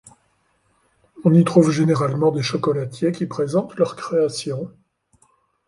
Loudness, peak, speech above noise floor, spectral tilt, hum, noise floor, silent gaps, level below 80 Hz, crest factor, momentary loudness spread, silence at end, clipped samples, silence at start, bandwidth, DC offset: -20 LUFS; -2 dBFS; 46 dB; -7 dB/octave; none; -65 dBFS; none; -62 dBFS; 20 dB; 10 LU; 1 s; under 0.1%; 1.15 s; 11.5 kHz; under 0.1%